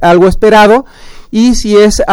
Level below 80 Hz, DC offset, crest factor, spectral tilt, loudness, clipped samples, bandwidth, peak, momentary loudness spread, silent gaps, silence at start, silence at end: -22 dBFS; under 0.1%; 6 dB; -5 dB/octave; -7 LUFS; 2%; 17 kHz; 0 dBFS; 6 LU; none; 0 s; 0 s